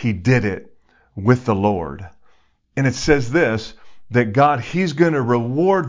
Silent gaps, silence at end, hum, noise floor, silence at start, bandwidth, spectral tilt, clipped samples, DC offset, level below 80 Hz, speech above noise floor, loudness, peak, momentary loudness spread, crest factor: none; 0 s; none; -56 dBFS; 0 s; 7.6 kHz; -7 dB/octave; under 0.1%; under 0.1%; -42 dBFS; 38 dB; -18 LUFS; -2 dBFS; 14 LU; 18 dB